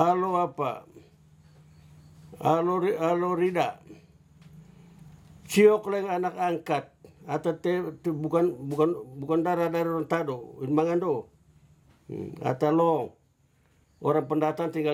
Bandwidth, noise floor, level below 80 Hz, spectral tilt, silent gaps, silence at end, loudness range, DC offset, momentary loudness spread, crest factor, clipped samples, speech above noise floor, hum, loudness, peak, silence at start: 17 kHz; -65 dBFS; -68 dBFS; -7 dB/octave; none; 0 s; 2 LU; under 0.1%; 10 LU; 20 dB; under 0.1%; 39 dB; none; -27 LUFS; -6 dBFS; 0 s